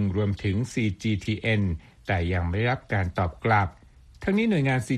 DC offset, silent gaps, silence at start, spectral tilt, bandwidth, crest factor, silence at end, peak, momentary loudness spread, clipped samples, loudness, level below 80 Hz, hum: under 0.1%; none; 0 s; -7 dB/octave; 11.5 kHz; 18 dB; 0 s; -6 dBFS; 6 LU; under 0.1%; -26 LUFS; -44 dBFS; none